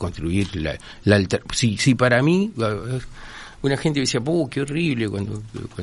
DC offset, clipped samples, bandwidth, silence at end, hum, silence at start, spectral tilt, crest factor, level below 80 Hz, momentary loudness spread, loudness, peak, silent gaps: under 0.1%; under 0.1%; 11.5 kHz; 0 s; none; 0 s; -5.5 dB/octave; 20 dB; -44 dBFS; 13 LU; -21 LUFS; -2 dBFS; none